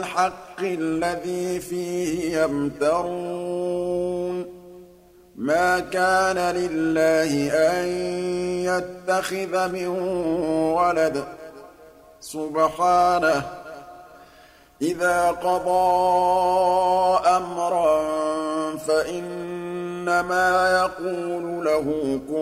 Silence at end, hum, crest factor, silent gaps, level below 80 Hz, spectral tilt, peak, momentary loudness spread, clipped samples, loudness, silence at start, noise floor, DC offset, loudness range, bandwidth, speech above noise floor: 0 s; none; 16 dB; none; -54 dBFS; -4.5 dB/octave; -6 dBFS; 11 LU; under 0.1%; -22 LUFS; 0 s; -51 dBFS; under 0.1%; 5 LU; 16 kHz; 29 dB